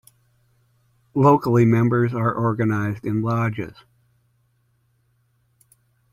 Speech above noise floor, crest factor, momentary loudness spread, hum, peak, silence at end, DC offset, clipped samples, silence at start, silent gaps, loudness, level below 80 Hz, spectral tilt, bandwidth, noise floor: 46 dB; 20 dB; 10 LU; none; -4 dBFS; 2.45 s; under 0.1%; under 0.1%; 1.15 s; none; -20 LUFS; -56 dBFS; -9 dB/octave; 13.5 kHz; -65 dBFS